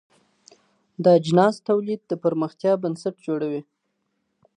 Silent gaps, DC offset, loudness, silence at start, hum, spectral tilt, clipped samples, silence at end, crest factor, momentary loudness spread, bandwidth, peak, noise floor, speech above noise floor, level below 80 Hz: none; under 0.1%; -22 LUFS; 1 s; none; -7.5 dB/octave; under 0.1%; 0.95 s; 20 dB; 11 LU; 10 kHz; -4 dBFS; -74 dBFS; 53 dB; -72 dBFS